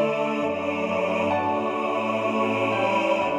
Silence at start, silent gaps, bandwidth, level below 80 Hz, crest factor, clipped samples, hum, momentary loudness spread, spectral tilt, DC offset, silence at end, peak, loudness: 0 s; none; 11 kHz; -66 dBFS; 14 dB; under 0.1%; none; 3 LU; -6 dB/octave; under 0.1%; 0 s; -10 dBFS; -24 LUFS